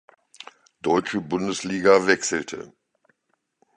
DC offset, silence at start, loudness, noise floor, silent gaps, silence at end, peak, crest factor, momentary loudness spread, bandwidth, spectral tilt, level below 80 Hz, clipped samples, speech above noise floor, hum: under 0.1%; 0.4 s; -22 LUFS; -74 dBFS; none; 1.1 s; -2 dBFS; 22 dB; 26 LU; 10 kHz; -4 dB/octave; -62 dBFS; under 0.1%; 52 dB; none